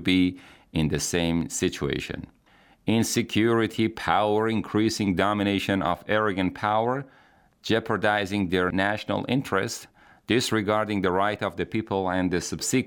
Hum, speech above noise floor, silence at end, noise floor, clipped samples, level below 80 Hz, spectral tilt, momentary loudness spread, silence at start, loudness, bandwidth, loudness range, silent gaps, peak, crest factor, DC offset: none; 34 dB; 0 s; -58 dBFS; under 0.1%; -54 dBFS; -4.5 dB/octave; 6 LU; 0 s; -25 LUFS; 19.5 kHz; 2 LU; none; -4 dBFS; 20 dB; under 0.1%